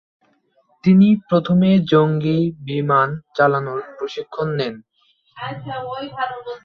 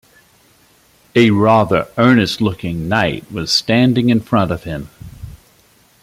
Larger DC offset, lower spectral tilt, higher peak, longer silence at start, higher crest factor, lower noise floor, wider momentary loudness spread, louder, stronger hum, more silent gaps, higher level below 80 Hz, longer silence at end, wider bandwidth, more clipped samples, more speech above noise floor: neither; first, -9 dB/octave vs -6 dB/octave; about the same, -2 dBFS vs -2 dBFS; second, 0.85 s vs 1.15 s; about the same, 16 dB vs 16 dB; first, -61 dBFS vs -52 dBFS; about the same, 14 LU vs 16 LU; second, -18 LUFS vs -15 LUFS; neither; neither; second, -58 dBFS vs -44 dBFS; second, 0.05 s vs 0.7 s; second, 6.2 kHz vs 15.5 kHz; neither; first, 43 dB vs 38 dB